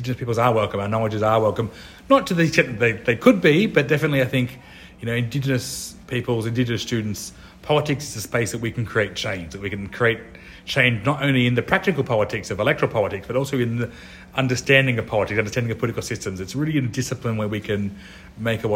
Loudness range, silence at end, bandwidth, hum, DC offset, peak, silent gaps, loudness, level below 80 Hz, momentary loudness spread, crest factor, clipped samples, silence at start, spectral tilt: 6 LU; 0 s; 16.5 kHz; none; under 0.1%; 0 dBFS; none; -22 LUFS; -48 dBFS; 12 LU; 20 dB; under 0.1%; 0 s; -5.5 dB/octave